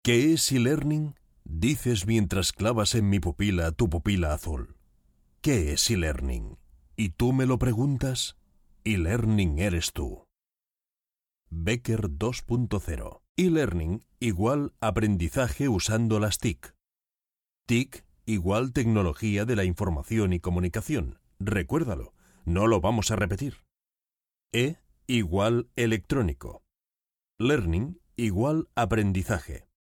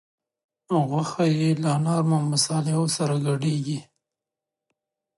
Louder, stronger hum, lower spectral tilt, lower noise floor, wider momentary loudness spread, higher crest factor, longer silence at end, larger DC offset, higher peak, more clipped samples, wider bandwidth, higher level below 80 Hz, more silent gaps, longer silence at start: second, -27 LUFS vs -24 LUFS; neither; about the same, -5.5 dB/octave vs -5.5 dB/octave; about the same, under -90 dBFS vs -88 dBFS; first, 12 LU vs 5 LU; about the same, 18 dB vs 16 dB; second, 0.25 s vs 1.35 s; neither; about the same, -8 dBFS vs -8 dBFS; neither; first, 17.5 kHz vs 11.5 kHz; first, -40 dBFS vs -70 dBFS; first, 13.29-13.35 s vs none; second, 0.05 s vs 0.7 s